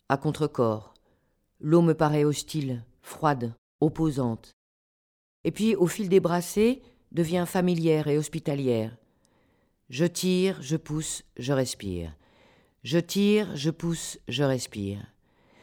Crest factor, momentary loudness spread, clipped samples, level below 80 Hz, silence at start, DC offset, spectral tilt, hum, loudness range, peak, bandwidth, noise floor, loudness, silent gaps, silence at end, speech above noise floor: 18 dB; 12 LU; under 0.1%; -56 dBFS; 0.1 s; under 0.1%; -6 dB/octave; none; 4 LU; -8 dBFS; 18 kHz; -70 dBFS; -27 LUFS; 3.58-3.79 s, 4.53-5.44 s; 0.6 s; 44 dB